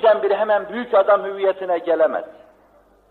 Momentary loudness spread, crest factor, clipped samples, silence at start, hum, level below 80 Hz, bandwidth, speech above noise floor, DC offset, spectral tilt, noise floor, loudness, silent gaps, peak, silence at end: 7 LU; 14 dB; under 0.1%; 0 s; none; -64 dBFS; 4.5 kHz; 35 dB; under 0.1%; -6.5 dB/octave; -54 dBFS; -19 LUFS; none; -4 dBFS; 0.8 s